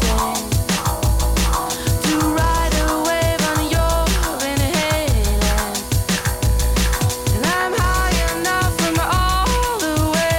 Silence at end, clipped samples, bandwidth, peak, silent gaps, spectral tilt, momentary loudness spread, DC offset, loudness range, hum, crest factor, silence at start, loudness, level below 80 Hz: 0 s; under 0.1%; 18.5 kHz; -8 dBFS; none; -4 dB/octave; 2 LU; under 0.1%; 1 LU; none; 10 dB; 0 s; -18 LUFS; -22 dBFS